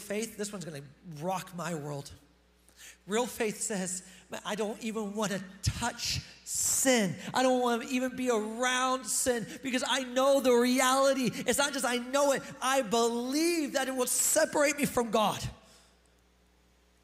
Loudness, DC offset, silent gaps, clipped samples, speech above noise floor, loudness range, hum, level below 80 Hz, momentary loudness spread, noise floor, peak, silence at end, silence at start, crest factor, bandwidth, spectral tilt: -29 LUFS; under 0.1%; none; under 0.1%; 35 dB; 8 LU; none; -58 dBFS; 13 LU; -65 dBFS; -14 dBFS; 1.45 s; 0 s; 16 dB; 16 kHz; -3 dB/octave